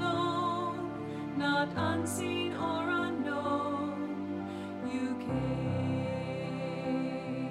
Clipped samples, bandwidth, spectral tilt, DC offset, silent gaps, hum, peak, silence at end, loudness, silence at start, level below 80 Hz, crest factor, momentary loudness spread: under 0.1%; 15 kHz; -6 dB/octave; under 0.1%; none; none; -18 dBFS; 0 s; -34 LUFS; 0 s; -60 dBFS; 14 dB; 6 LU